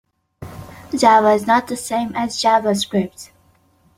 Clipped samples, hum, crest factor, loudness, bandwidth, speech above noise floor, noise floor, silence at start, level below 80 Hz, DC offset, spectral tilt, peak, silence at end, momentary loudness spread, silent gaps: under 0.1%; none; 18 dB; -17 LUFS; 16.5 kHz; 40 dB; -57 dBFS; 0.4 s; -54 dBFS; under 0.1%; -4 dB/octave; -2 dBFS; 0.7 s; 23 LU; none